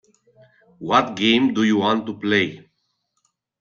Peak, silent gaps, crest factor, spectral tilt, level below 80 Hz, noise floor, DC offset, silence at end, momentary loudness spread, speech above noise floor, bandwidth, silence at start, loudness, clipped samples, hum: -2 dBFS; none; 20 dB; -5 dB/octave; -62 dBFS; -72 dBFS; under 0.1%; 1 s; 6 LU; 53 dB; 7.2 kHz; 0.8 s; -19 LUFS; under 0.1%; none